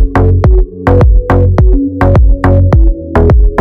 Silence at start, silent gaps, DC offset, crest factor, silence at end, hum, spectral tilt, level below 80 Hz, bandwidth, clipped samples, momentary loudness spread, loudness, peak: 0 s; none; under 0.1%; 6 dB; 0 s; none; -10 dB/octave; -8 dBFS; 4.9 kHz; 4%; 3 LU; -9 LUFS; 0 dBFS